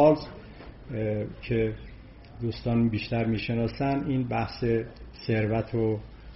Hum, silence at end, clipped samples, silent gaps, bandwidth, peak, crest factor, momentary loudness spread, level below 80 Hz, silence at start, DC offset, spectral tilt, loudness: none; 0 s; under 0.1%; none; 5.8 kHz; -8 dBFS; 20 dB; 17 LU; -46 dBFS; 0 s; under 0.1%; -6.5 dB/octave; -28 LUFS